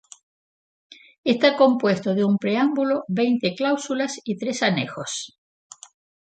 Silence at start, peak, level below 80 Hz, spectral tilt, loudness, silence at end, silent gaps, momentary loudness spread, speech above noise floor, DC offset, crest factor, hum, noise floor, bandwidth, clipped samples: 1.25 s; -4 dBFS; -70 dBFS; -5 dB/octave; -22 LUFS; 1 s; none; 11 LU; over 69 dB; under 0.1%; 20 dB; none; under -90 dBFS; 9.2 kHz; under 0.1%